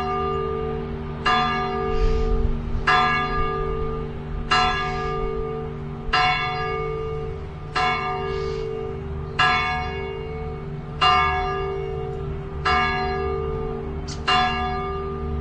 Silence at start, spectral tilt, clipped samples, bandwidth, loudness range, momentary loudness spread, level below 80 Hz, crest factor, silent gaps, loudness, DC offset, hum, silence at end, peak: 0 s; -5.5 dB/octave; under 0.1%; 9.2 kHz; 2 LU; 12 LU; -32 dBFS; 18 dB; none; -24 LUFS; under 0.1%; none; 0 s; -6 dBFS